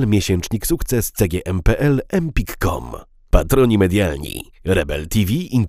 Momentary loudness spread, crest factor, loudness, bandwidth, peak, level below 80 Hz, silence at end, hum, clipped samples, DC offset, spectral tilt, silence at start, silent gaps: 12 LU; 18 dB; -19 LUFS; 16 kHz; 0 dBFS; -26 dBFS; 0 s; none; under 0.1%; under 0.1%; -6 dB/octave; 0 s; none